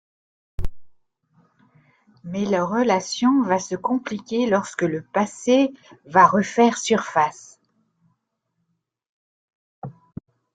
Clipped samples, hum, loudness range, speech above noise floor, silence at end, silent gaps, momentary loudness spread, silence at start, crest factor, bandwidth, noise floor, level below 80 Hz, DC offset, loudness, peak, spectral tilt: under 0.1%; none; 7 LU; 55 dB; 0.65 s; 9.09-9.48 s, 9.55-9.82 s; 23 LU; 0.6 s; 20 dB; 9.4 kHz; -75 dBFS; -44 dBFS; under 0.1%; -21 LUFS; -2 dBFS; -5 dB/octave